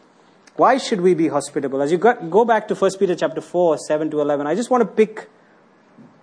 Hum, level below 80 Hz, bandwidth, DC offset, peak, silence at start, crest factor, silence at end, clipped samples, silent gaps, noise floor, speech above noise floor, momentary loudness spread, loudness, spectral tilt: none; -70 dBFS; 10.5 kHz; under 0.1%; -4 dBFS; 0.55 s; 16 dB; 1 s; under 0.1%; none; -52 dBFS; 34 dB; 6 LU; -19 LUFS; -5.5 dB/octave